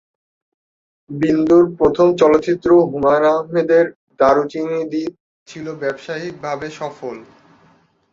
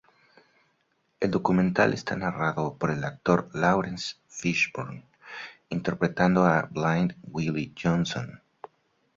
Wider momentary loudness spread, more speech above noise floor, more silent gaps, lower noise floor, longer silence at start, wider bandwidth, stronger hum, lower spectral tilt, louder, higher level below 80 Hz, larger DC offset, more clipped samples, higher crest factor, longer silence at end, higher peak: about the same, 16 LU vs 16 LU; second, 39 dB vs 46 dB; first, 3.96-4.07 s, 5.20-5.46 s vs none; second, -55 dBFS vs -72 dBFS; about the same, 1.1 s vs 1.2 s; about the same, 7.6 kHz vs 7.6 kHz; neither; about the same, -7 dB/octave vs -6 dB/octave; first, -16 LUFS vs -26 LUFS; about the same, -52 dBFS vs -56 dBFS; neither; neither; about the same, 16 dB vs 20 dB; about the same, 0.9 s vs 0.8 s; first, -2 dBFS vs -6 dBFS